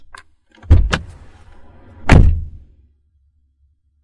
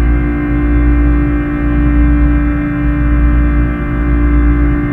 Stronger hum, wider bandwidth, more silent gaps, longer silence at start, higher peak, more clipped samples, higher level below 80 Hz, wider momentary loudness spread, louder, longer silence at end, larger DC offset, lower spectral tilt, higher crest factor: neither; first, 11 kHz vs 3.4 kHz; neither; first, 0.7 s vs 0 s; about the same, 0 dBFS vs 0 dBFS; neither; second, -22 dBFS vs -12 dBFS; first, 20 LU vs 3 LU; about the same, -15 LUFS vs -13 LUFS; first, 1.55 s vs 0 s; neither; second, -6.5 dB/octave vs -10.5 dB/octave; first, 16 dB vs 10 dB